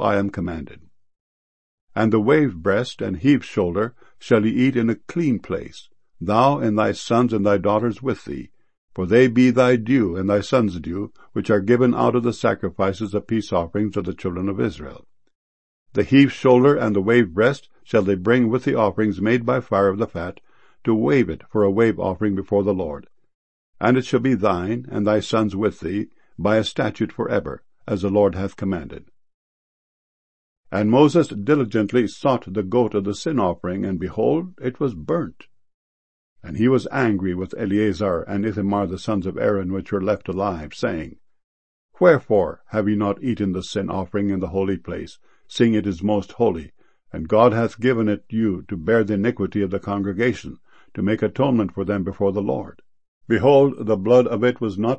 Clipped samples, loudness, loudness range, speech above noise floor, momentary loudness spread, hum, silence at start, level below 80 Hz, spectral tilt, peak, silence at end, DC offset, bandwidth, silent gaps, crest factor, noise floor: under 0.1%; -20 LUFS; 5 LU; over 70 dB; 12 LU; none; 0 s; -50 dBFS; -7.5 dB/octave; -2 dBFS; 0 s; 0.5%; 8.6 kHz; 1.20-1.87 s, 8.78-8.88 s, 15.35-15.86 s, 23.34-23.73 s, 29.34-30.64 s, 35.74-36.36 s, 41.44-41.89 s, 53.08-53.21 s; 20 dB; under -90 dBFS